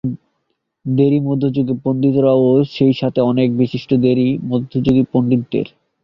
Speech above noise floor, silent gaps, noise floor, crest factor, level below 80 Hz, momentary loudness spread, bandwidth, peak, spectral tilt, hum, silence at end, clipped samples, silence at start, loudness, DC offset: 56 dB; none; -70 dBFS; 14 dB; -50 dBFS; 9 LU; 5.8 kHz; -2 dBFS; -10 dB/octave; none; 0.4 s; under 0.1%; 0.05 s; -16 LUFS; under 0.1%